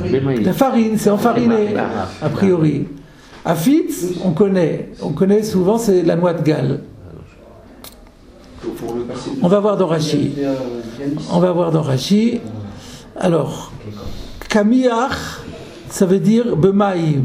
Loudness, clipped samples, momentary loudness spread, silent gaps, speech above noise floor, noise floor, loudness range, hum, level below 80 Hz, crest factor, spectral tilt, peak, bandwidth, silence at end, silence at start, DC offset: -17 LUFS; under 0.1%; 16 LU; none; 26 dB; -42 dBFS; 4 LU; none; -44 dBFS; 16 dB; -6.5 dB/octave; 0 dBFS; 16 kHz; 0 s; 0 s; under 0.1%